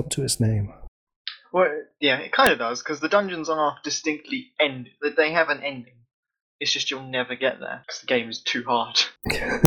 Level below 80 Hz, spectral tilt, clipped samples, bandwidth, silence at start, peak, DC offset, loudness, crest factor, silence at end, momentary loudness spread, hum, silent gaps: -52 dBFS; -3.5 dB/octave; under 0.1%; 16 kHz; 0 s; -4 dBFS; under 0.1%; -24 LUFS; 22 dB; 0 s; 11 LU; none; 0.88-1.07 s, 1.16-1.25 s, 6.14-6.23 s, 6.41-6.59 s